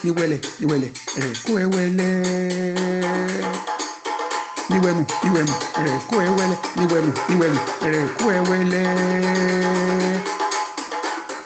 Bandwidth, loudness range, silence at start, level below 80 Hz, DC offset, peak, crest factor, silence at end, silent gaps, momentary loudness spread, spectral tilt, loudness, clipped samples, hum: 9 kHz; 3 LU; 0 s; -58 dBFS; under 0.1%; -6 dBFS; 16 dB; 0 s; none; 7 LU; -5.5 dB/octave; -21 LUFS; under 0.1%; none